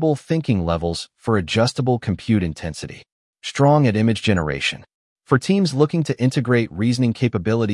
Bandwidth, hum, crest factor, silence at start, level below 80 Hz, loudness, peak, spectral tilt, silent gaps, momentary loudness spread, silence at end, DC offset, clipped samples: 12 kHz; none; 16 dB; 0 s; -48 dBFS; -20 LUFS; -4 dBFS; -6.5 dB/octave; 3.12-3.33 s, 4.94-5.16 s; 11 LU; 0 s; under 0.1%; under 0.1%